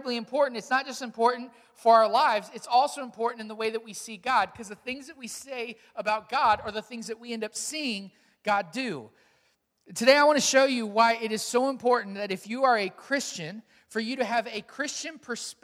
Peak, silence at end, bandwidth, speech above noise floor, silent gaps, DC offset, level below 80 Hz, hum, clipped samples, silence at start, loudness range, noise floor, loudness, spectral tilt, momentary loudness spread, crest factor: -6 dBFS; 0.1 s; 15.5 kHz; 43 dB; none; under 0.1%; -70 dBFS; none; under 0.1%; 0 s; 7 LU; -70 dBFS; -27 LUFS; -2.5 dB/octave; 16 LU; 22 dB